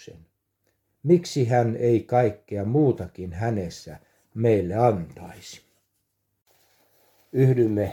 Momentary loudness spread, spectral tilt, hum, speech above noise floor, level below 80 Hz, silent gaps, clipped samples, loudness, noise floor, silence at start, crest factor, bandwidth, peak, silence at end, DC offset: 20 LU; -8 dB/octave; none; 52 dB; -56 dBFS; 6.42-6.46 s; under 0.1%; -23 LUFS; -75 dBFS; 1.05 s; 18 dB; 14 kHz; -6 dBFS; 0 s; under 0.1%